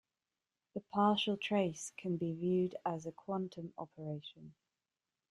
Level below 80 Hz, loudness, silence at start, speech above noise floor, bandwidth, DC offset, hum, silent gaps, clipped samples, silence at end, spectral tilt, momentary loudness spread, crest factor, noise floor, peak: -78 dBFS; -37 LUFS; 0.75 s; over 53 dB; 12 kHz; under 0.1%; none; none; under 0.1%; 0.8 s; -5.5 dB/octave; 15 LU; 22 dB; under -90 dBFS; -18 dBFS